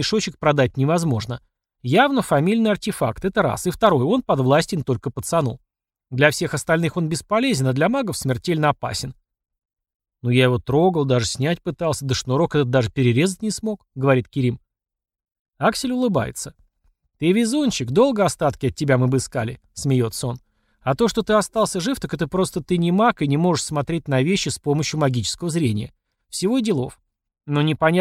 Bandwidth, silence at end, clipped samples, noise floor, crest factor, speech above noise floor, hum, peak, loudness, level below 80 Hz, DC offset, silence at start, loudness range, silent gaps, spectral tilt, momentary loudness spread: 15.5 kHz; 0 s; under 0.1%; -65 dBFS; 20 dB; 45 dB; none; 0 dBFS; -21 LUFS; -48 dBFS; under 0.1%; 0 s; 3 LU; 9.95-10.00 s, 15.39-15.45 s; -5.5 dB/octave; 9 LU